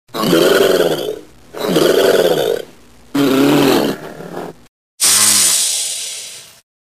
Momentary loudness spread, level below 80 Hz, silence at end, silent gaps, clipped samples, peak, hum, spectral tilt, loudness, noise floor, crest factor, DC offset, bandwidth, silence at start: 20 LU; -52 dBFS; 0.45 s; 4.68-4.98 s; under 0.1%; 0 dBFS; none; -2.5 dB/octave; -13 LUFS; -44 dBFS; 14 dB; 0.5%; 16 kHz; 0.15 s